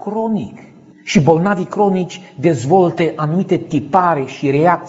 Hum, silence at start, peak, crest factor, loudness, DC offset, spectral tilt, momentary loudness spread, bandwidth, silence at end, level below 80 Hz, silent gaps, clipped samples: none; 0 s; 0 dBFS; 16 dB; -16 LUFS; under 0.1%; -7 dB/octave; 8 LU; 8 kHz; 0 s; -52 dBFS; none; under 0.1%